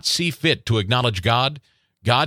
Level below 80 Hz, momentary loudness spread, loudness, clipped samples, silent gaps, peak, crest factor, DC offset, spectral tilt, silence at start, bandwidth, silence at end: -50 dBFS; 3 LU; -20 LUFS; under 0.1%; none; 0 dBFS; 20 dB; under 0.1%; -4 dB/octave; 0.05 s; 16 kHz; 0 s